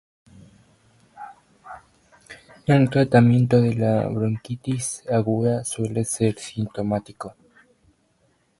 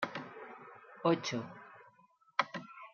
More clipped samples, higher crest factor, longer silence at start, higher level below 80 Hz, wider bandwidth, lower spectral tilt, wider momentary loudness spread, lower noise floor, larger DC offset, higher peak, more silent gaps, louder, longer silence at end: neither; second, 20 dB vs 26 dB; first, 1.15 s vs 0 s; first, -56 dBFS vs -88 dBFS; first, 11.5 kHz vs 7.2 kHz; first, -6.5 dB/octave vs -3.5 dB/octave; first, 26 LU vs 21 LU; about the same, -65 dBFS vs -67 dBFS; neither; first, -4 dBFS vs -14 dBFS; neither; first, -22 LUFS vs -37 LUFS; first, 1.3 s vs 0.05 s